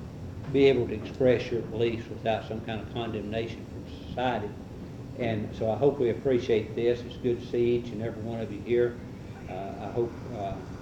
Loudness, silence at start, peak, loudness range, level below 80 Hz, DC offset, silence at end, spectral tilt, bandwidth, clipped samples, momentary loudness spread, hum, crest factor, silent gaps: -29 LUFS; 0 s; -8 dBFS; 5 LU; -52 dBFS; under 0.1%; 0 s; -7.5 dB/octave; 8.6 kHz; under 0.1%; 15 LU; none; 20 dB; none